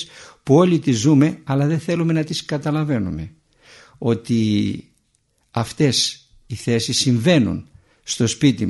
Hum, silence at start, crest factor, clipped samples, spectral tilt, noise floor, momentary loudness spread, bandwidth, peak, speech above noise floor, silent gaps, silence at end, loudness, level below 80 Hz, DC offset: none; 0 s; 18 dB; under 0.1%; -5.5 dB/octave; -65 dBFS; 16 LU; 11.5 kHz; -2 dBFS; 47 dB; none; 0 s; -19 LUFS; -50 dBFS; under 0.1%